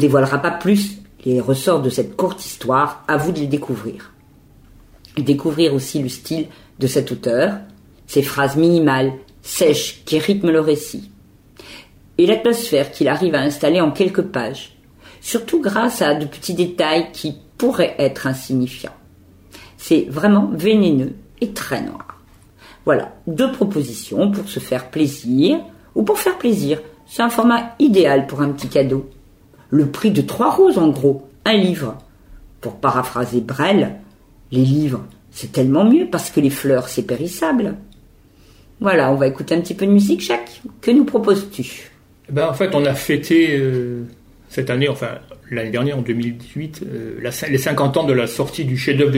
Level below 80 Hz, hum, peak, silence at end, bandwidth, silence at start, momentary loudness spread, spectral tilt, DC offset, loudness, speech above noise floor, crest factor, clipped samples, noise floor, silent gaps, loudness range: -52 dBFS; none; -2 dBFS; 0 s; 16.5 kHz; 0 s; 14 LU; -6 dB/octave; under 0.1%; -18 LUFS; 31 dB; 16 dB; under 0.1%; -48 dBFS; none; 4 LU